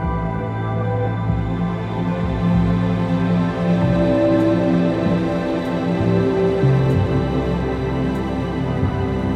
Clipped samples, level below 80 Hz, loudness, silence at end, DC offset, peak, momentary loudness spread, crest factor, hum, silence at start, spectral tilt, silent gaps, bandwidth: under 0.1%; -32 dBFS; -19 LUFS; 0 s; under 0.1%; -6 dBFS; 6 LU; 14 dB; none; 0 s; -9 dB/octave; none; 8 kHz